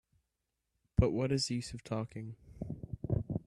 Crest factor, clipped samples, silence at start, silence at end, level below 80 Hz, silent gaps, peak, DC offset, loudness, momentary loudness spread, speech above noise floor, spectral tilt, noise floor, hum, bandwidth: 24 dB; under 0.1%; 1 s; 0.05 s; -50 dBFS; none; -14 dBFS; under 0.1%; -36 LUFS; 15 LU; 50 dB; -6 dB/octave; -86 dBFS; none; 12.5 kHz